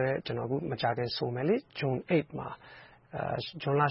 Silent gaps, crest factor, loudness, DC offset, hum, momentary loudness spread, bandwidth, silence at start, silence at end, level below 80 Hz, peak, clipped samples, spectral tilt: none; 18 dB; -32 LUFS; under 0.1%; none; 13 LU; 5.8 kHz; 0 s; 0 s; -64 dBFS; -12 dBFS; under 0.1%; -10.5 dB/octave